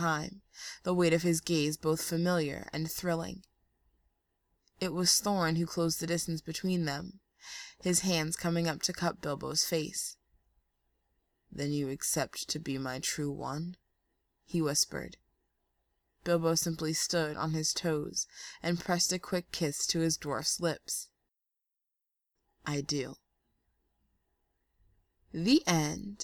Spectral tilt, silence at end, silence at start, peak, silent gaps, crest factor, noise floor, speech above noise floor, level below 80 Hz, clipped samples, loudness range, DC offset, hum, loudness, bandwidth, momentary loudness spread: -3.5 dB/octave; 0 s; 0 s; -12 dBFS; none; 22 dB; -87 dBFS; 55 dB; -62 dBFS; under 0.1%; 5 LU; under 0.1%; none; -32 LUFS; over 20 kHz; 12 LU